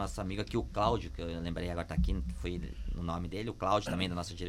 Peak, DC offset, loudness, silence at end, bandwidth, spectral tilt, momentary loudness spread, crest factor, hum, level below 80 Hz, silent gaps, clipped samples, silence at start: -14 dBFS; under 0.1%; -35 LUFS; 0 s; 13.5 kHz; -6 dB/octave; 8 LU; 20 dB; none; -40 dBFS; none; under 0.1%; 0 s